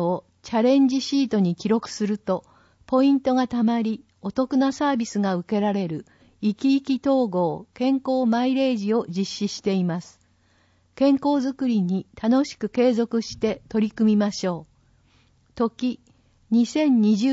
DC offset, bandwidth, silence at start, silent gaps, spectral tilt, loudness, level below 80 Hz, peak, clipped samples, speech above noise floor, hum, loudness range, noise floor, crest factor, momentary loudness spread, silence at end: under 0.1%; 8 kHz; 0 s; none; -6.5 dB/octave; -23 LUFS; -60 dBFS; -8 dBFS; under 0.1%; 40 dB; none; 2 LU; -62 dBFS; 14 dB; 9 LU; 0 s